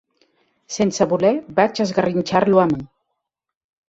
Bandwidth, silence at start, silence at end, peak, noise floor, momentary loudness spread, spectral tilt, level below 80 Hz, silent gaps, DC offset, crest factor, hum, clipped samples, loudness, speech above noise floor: 8 kHz; 0.7 s; 1 s; -2 dBFS; -78 dBFS; 6 LU; -5.5 dB/octave; -56 dBFS; none; under 0.1%; 18 dB; none; under 0.1%; -18 LUFS; 60 dB